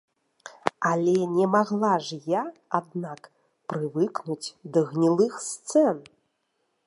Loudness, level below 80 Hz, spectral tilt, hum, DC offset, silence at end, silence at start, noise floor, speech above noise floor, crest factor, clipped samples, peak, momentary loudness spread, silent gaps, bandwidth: -26 LUFS; -78 dBFS; -5.5 dB/octave; none; under 0.1%; 0.85 s; 0.45 s; -75 dBFS; 50 dB; 24 dB; under 0.1%; -2 dBFS; 13 LU; none; 11.5 kHz